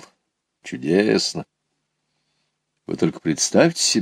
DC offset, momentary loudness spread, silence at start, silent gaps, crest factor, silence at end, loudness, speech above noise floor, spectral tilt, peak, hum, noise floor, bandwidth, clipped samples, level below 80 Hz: under 0.1%; 17 LU; 0.65 s; none; 22 dB; 0 s; -19 LUFS; 56 dB; -3.5 dB/octave; 0 dBFS; none; -75 dBFS; 16 kHz; under 0.1%; -62 dBFS